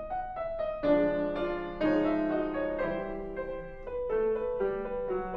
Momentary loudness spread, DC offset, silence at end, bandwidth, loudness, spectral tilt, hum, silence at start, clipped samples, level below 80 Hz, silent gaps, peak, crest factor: 10 LU; under 0.1%; 0 s; 5.6 kHz; -31 LUFS; -8.5 dB/octave; none; 0 s; under 0.1%; -48 dBFS; none; -14 dBFS; 16 dB